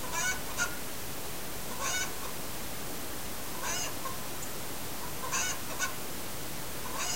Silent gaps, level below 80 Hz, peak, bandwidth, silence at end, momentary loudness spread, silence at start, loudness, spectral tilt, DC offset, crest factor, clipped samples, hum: none; -54 dBFS; -18 dBFS; 16 kHz; 0 s; 7 LU; 0 s; -35 LUFS; -1.5 dB/octave; 1%; 18 dB; under 0.1%; none